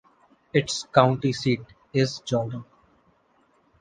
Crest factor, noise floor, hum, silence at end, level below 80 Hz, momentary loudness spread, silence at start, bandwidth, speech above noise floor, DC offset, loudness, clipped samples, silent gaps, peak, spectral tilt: 24 dB; -64 dBFS; none; 1.15 s; -60 dBFS; 10 LU; 0.55 s; 9.6 kHz; 41 dB; under 0.1%; -24 LUFS; under 0.1%; none; -2 dBFS; -5.5 dB/octave